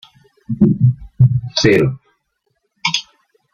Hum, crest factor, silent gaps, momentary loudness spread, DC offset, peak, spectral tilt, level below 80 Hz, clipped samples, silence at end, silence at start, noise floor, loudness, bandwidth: none; 16 dB; none; 9 LU; under 0.1%; -2 dBFS; -6 dB/octave; -44 dBFS; under 0.1%; 0.55 s; 0.5 s; -68 dBFS; -15 LUFS; 7.2 kHz